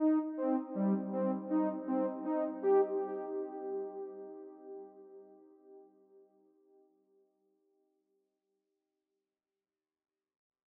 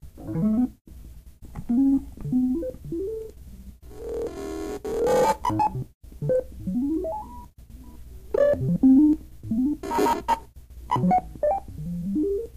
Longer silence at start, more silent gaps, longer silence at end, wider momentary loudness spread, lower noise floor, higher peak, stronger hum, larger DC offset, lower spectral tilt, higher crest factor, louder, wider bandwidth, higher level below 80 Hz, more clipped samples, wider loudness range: about the same, 0 s vs 0.05 s; second, none vs 0.81-0.85 s, 5.94-6.01 s; first, 4.85 s vs 0 s; first, 20 LU vs 15 LU; first, under -90 dBFS vs -44 dBFS; second, -20 dBFS vs -10 dBFS; neither; neither; first, -10 dB/octave vs -7.5 dB/octave; about the same, 18 dB vs 16 dB; second, -35 LUFS vs -25 LUFS; second, 3 kHz vs 15.5 kHz; second, under -90 dBFS vs -44 dBFS; neither; first, 21 LU vs 5 LU